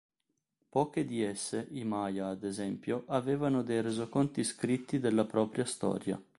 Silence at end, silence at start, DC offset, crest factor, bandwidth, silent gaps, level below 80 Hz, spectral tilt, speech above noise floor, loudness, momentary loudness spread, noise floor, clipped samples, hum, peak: 0.15 s; 0.75 s; under 0.1%; 18 dB; 11.5 kHz; none; -68 dBFS; -5.5 dB/octave; 51 dB; -33 LUFS; 6 LU; -84 dBFS; under 0.1%; none; -16 dBFS